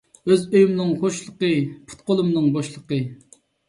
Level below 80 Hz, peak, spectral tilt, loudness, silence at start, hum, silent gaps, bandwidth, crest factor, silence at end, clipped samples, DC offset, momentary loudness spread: -62 dBFS; -4 dBFS; -6.5 dB/octave; -21 LUFS; 0.25 s; none; none; 11.5 kHz; 16 dB; 0.55 s; under 0.1%; under 0.1%; 10 LU